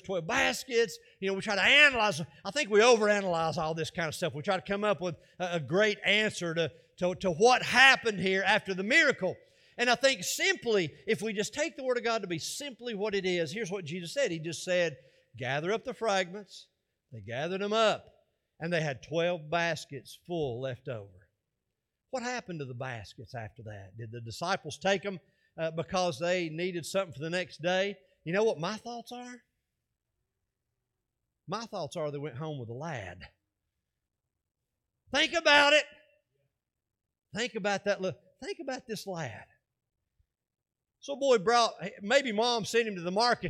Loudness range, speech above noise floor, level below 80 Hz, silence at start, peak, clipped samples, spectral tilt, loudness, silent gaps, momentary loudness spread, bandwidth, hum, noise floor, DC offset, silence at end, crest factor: 15 LU; 57 dB; -68 dBFS; 0.05 s; -8 dBFS; under 0.1%; -3.5 dB/octave; -29 LUFS; none; 18 LU; 16 kHz; none; -87 dBFS; under 0.1%; 0 s; 24 dB